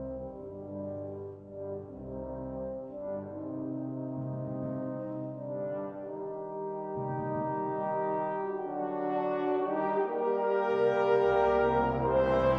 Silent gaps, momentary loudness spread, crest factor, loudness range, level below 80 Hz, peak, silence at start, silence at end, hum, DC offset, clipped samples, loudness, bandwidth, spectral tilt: none; 14 LU; 16 dB; 11 LU; -54 dBFS; -14 dBFS; 0 s; 0 s; none; under 0.1%; under 0.1%; -32 LUFS; 6.4 kHz; -9 dB/octave